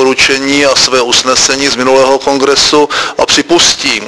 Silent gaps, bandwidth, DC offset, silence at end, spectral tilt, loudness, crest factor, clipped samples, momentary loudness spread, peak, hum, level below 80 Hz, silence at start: none; 11 kHz; under 0.1%; 0 s; -1.5 dB/octave; -7 LUFS; 8 dB; 1%; 3 LU; 0 dBFS; none; -40 dBFS; 0 s